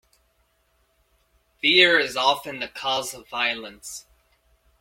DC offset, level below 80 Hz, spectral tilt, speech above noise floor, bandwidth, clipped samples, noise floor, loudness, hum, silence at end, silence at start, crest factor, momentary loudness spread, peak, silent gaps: under 0.1%; -64 dBFS; -1.5 dB/octave; 44 dB; 16.5 kHz; under 0.1%; -67 dBFS; -21 LUFS; none; 0.8 s; 1.65 s; 24 dB; 21 LU; -2 dBFS; none